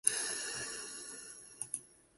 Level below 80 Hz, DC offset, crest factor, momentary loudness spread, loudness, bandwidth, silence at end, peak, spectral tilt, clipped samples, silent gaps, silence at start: -76 dBFS; under 0.1%; 34 dB; 11 LU; -39 LUFS; 12 kHz; 0.2 s; -8 dBFS; 0.5 dB/octave; under 0.1%; none; 0.05 s